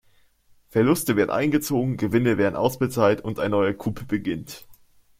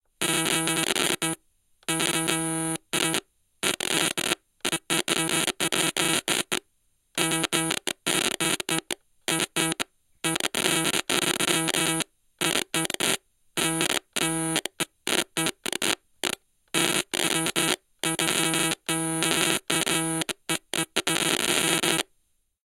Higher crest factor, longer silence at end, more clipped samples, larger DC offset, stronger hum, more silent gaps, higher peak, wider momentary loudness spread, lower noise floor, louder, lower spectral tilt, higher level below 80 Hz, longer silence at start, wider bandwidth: second, 18 dB vs 24 dB; second, 0.45 s vs 0.65 s; neither; neither; neither; neither; second, -6 dBFS vs -2 dBFS; first, 10 LU vs 7 LU; second, -58 dBFS vs -70 dBFS; about the same, -23 LUFS vs -25 LUFS; first, -6 dB/octave vs -2 dB/octave; first, -54 dBFS vs -64 dBFS; first, 0.75 s vs 0.2 s; about the same, 16.5 kHz vs 17 kHz